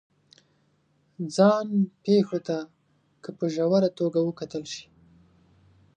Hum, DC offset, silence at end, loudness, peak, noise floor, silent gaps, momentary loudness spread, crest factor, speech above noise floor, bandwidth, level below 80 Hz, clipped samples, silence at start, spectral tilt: none; under 0.1%; 1.15 s; -25 LUFS; -8 dBFS; -67 dBFS; none; 17 LU; 20 dB; 43 dB; 9.6 kHz; -72 dBFS; under 0.1%; 1.2 s; -7 dB/octave